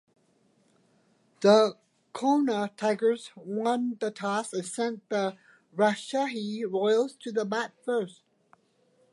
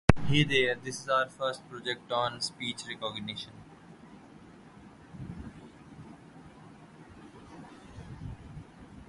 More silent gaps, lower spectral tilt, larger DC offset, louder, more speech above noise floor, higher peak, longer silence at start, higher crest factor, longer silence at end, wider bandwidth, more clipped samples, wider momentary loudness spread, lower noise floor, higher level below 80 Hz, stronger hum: neither; about the same, -5 dB/octave vs -5 dB/octave; neither; first, -28 LUFS vs -31 LUFS; first, 40 dB vs 21 dB; second, -8 dBFS vs 0 dBFS; first, 1.4 s vs 0.1 s; second, 20 dB vs 34 dB; first, 1 s vs 0.05 s; about the same, 11.5 kHz vs 11.5 kHz; neither; second, 10 LU vs 25 LU; first, -67 dBFS vs -53 dBFS; second, -82 dBFS vs -48 dBFS; neither